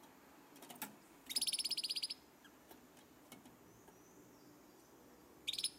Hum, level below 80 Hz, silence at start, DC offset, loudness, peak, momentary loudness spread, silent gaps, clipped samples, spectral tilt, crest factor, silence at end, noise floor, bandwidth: none; -82 dBFS; 0 s; under 0.1%; -41 LUFS; -24 dBFS; 25 LU; none; under 0.1%; 0.5 dB/octave; 24 dB; 0 s; -64 dBFS; 16 kHz